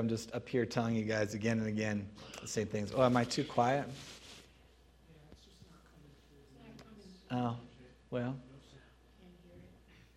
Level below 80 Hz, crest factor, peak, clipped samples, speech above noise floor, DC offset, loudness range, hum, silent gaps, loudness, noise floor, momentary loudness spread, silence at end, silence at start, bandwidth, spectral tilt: -64 dBFS; 24 dB; -14 dBFS; under 0.1%; 28 dB; under 0.1%; 12 LU; none; none; -36 LUFS; -63 dBFS; 24 LU; 0.5 s; 0 s; 14.5 kHz; -5.5 dB/octave